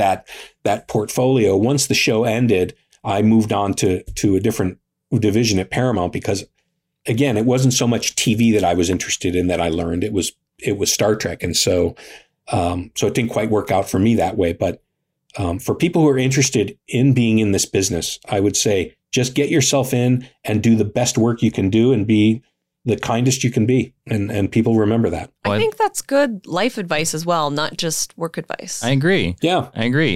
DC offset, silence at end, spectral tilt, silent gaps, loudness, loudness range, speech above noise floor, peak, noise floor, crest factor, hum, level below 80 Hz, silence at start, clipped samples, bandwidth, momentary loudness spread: under 0.1%; 0 s; -5 dB/octave; none; -18 LUFS; 3 LU; 53 dB; -6 dBFS; -70 dBFS; 12 dB; none; -48 dBFS; 0 s; under 0.1%; 16 kHz; 8 LU